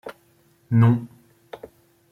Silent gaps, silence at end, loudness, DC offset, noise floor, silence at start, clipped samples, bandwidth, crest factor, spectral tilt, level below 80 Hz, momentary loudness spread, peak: none; 0.55 s; -20 LUFS; under 0.1%; -60 dBFS; 0.05 s; under 0.1%; 4.1 kHz; 18 dB; -10 dB/octave; -64 dBFS; 25 LU; -6 dBFS